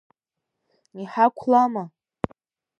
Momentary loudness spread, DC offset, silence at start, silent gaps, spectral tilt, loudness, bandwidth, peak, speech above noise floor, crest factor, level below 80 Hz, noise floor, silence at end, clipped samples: 17 LU; under 0.1%; 0.95 s; none; -7.5 dB/octave; -23 LUFS; 7 kHz; -4 dBFS; 62 dB; 20 dB; -60 dBFS; -83 dBFS; 0.9 s; under 0.1%